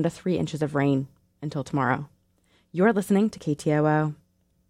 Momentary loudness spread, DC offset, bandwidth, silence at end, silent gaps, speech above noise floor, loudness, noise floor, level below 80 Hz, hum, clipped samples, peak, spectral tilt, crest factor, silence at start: 12 LU; under 0.1%; 15 kHz; 0.55 s; none; 41 dB; -25 LUFS; -65 dBFS; -60 dBFS; none; under 0.1%; -8 dBFS; -7 dB/octave; 18 dB; 0 s